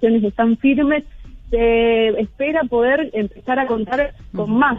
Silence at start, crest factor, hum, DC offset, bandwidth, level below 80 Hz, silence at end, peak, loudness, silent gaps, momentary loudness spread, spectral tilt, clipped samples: 0 s; 14 dB; none; under 0.1%; 3.9 kHz; -36 dBFS; 0 s; -4 dBFS; -18 LUFS; none; 8 LU; -8 dB/octave; under 0.1%